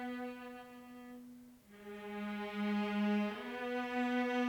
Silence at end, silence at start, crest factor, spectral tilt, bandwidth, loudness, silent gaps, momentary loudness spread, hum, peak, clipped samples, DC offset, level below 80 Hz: 0 s; 0 s; 14 dB; -6.5 dB/octave; 19.5 kHz; -38 LUFS; none; 19 LU; none; -24 dBFS; under 0.1%; under 0.1%; -76 dBFS